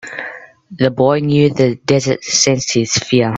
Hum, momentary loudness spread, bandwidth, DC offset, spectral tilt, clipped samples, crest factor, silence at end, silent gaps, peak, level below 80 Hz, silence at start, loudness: none; 8 LU; 8.4 kHz; under 0.1%; -4.5 dB/octave; under 0.1%; 14 dB; 0 s; none; 0 dBFS; -50 dBFS; 0.05 s; -14 LUFS